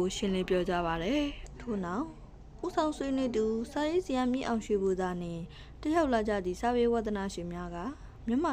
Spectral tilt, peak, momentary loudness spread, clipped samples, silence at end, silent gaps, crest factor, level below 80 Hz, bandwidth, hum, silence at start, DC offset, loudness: -5.5 dB/octave; -16 dBFS; 11 LU; under 0.1%; 0 s; none; 16 dB; -48 dBFS; 15.5 kHz; none; 0 s; under 0.1%; -32 LUFS